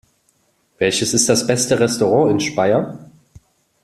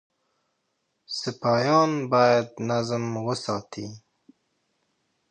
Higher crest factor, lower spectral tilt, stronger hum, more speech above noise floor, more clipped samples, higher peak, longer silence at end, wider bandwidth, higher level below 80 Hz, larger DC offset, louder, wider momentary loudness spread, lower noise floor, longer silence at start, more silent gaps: about the same, 18 dB vs 20 dB; second, -3.5 dB/octave vs -5.5 dB/octave; neither; second, 46 dB vs 52 dB; neither; first, 0 dBFS vs -8 dBFS; second, 0.8 s vs 1.35 s; first, 14 kHz vs 9.6 kHz; first, -54 dBFS vs -68 dBFS; neither; first, -16 LUFS vs -24 LUFS; second, 5 LU vs 14 LU; second, -62 dBFS vs -76 dBFS; second, 0.8 s vs 1.1 s; neither